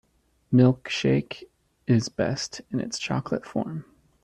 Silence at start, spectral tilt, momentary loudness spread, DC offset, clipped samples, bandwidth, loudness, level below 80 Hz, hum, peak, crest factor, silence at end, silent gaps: 0.5 s; -6 dB/octave; 17 LU; under 0.1%; under 0.1%; 10.5 kHz; -25 LUFS; -58 dBFS; none; -8 dBFS; 18 dB; 0.4 s; none